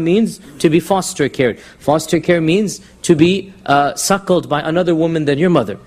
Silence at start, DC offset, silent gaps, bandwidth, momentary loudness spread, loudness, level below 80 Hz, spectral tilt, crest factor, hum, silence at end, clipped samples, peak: 0 s; under 0.1%; none; 15.5 kHz; 5 LU; -15 LUFS; -48 dBFS; -5.5 dB/octave; 14 dB; none; 0.1 s; under 0.1%; 0 dBFS